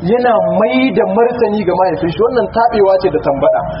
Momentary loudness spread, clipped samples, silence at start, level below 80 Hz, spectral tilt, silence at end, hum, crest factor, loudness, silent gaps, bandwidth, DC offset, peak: 3 LU; under 0.1%; 0 s; -40 dBFS; -5 dB/octave; 0 s; none; 12 dB; -12 LUFS; none; 5.6 kHz; under 0.1%; 0 dBFS